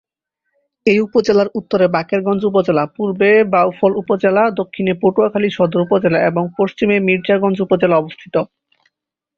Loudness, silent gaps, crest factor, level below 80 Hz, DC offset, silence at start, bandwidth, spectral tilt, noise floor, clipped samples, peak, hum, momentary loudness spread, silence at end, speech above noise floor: -15 LUFS; none; 14 dB; -56 dBFS; under 0.1%; 0.85 s; 7.2 kHz; -7.5 dB/octave; -75 dBFS; under 0.1%; -2 dBFS; none; 6 LU; 0.95 s; 61 dB